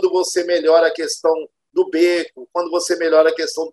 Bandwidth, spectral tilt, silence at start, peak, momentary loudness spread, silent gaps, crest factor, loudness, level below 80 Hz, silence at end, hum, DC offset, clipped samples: 12.5 kHz; -1.5 dB/octave; 0 s; -2 dBFS; 9 LU; none; 16 dB; -17 LUFS; -72 dBFS; 0 s; none; under 0.1%; under 0.1%